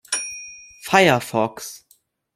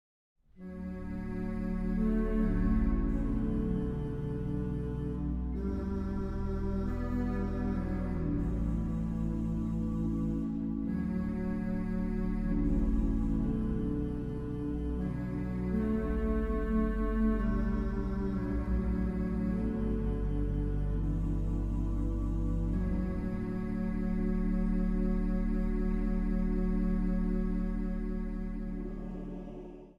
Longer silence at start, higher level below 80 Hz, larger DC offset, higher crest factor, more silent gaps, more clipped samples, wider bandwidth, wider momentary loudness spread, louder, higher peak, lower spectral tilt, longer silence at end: second, 0.1 s vs 0.55 s; second, -62 dBFS vs -36 dBFS; neither; first, 22 dB vs 12 dB; neither; neither; first, 16 kHz vs 5.4 kHz; first, 20 LU vs 5 LU; first, -19 LUFS vs -34 LUFS; first, 0 dBFS vs -18 dBFS; second, -3.5 dB/octave vs -10 dB/octave; first, 0.6 s vs 0.05 s